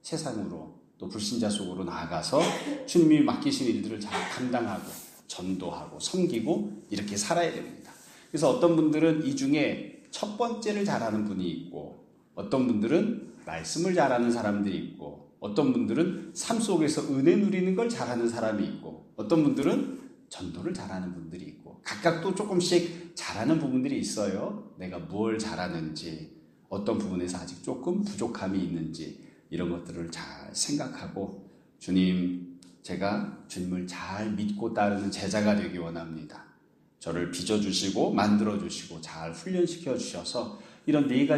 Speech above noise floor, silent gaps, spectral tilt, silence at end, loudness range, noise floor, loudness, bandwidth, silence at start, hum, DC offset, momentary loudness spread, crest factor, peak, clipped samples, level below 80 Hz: 34 dB; none; -5 dB/octave; 0 s; 6 LU; -62 dBFS; -29 LUFS; 15 kHz; 0.05 s; none; under 0.1%; 16 LU; 20 dB; -8 dBFS; under 0.1%; -64 dBFS